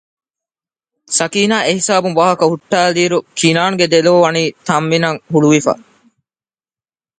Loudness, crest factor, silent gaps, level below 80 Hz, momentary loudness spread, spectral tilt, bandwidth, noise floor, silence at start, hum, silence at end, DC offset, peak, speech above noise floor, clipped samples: -13 LUFS; 14 dB; none; -60 dBFS; 6 LU; -4 dB/octave; 9.6 kHz; under -90 dBFS; 1.1 s; none; 1.45 s; under 0.1%; 0 dBFS; over 77 dB; under 0.1%